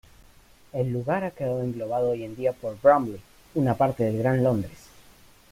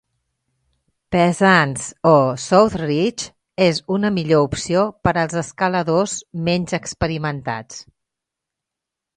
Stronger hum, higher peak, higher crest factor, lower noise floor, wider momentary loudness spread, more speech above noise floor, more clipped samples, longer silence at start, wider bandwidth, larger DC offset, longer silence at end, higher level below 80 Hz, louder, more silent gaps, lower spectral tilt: neither; second, -6 dBFS vs 0 dBFS; about the same, 20 dB vs 20 dB; second, -54 dBFS vs -84 dBFS; about the same, 12 LU vs 10 LU; second, 29 dB vs 66 dB; neither; second, 0.75 s vs 1.1 s; first, 16 kHz vs 11 kHz; neither; second, 0.75 s vs 1.35 s; second, -56 dBFS vs -46 dBFS; second, -25 LUFS vs -18 LUFS; neither; first, -8.5 dB/octave vs -5 dB/octave